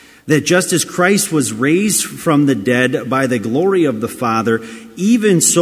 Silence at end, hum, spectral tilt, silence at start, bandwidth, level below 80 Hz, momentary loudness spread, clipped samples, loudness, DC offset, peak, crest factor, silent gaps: 0 s; none; -4 dB/octave; 0.25 s; 16 kHz; -54 dBFS; 5 LU; under 0.1%; -14 LUFS; under 0.1%; 0 dBFS; 14 dB; none